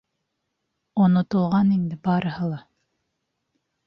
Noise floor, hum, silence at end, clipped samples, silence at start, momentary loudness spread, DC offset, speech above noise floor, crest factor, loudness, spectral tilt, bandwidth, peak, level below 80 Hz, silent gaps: -78 dBFS; none; 1.25 s; under 0.1%; 0.95 s; 11 LU; under 0.1%; 57 dB; 16 dB; -22 LUFS; -10 dB/octave; 5.8 kHz; -8 dBFS; -60 dBFS; none